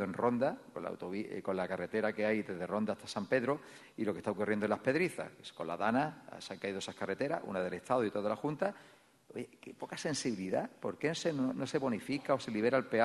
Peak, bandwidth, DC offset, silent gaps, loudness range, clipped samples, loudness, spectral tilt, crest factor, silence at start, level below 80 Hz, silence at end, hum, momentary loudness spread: -16 dBFS; 12 kHz; under 0.1%; none; 3 LU; under 0.1%; -36 LUFS; -5.5 dB/octave; 20 dB; 0 s; -76 dBFS; 0 s; none; 12 LU